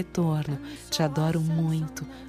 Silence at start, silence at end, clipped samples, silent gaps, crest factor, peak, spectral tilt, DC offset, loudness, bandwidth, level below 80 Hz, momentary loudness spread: 0 s; 0 s; under 0.1%; none; 16 dB; -12 dBFS; -6 dB/octave; under 0.1%; -27 LUFS; 14.5 kHz; -52 dBFS; 8 LU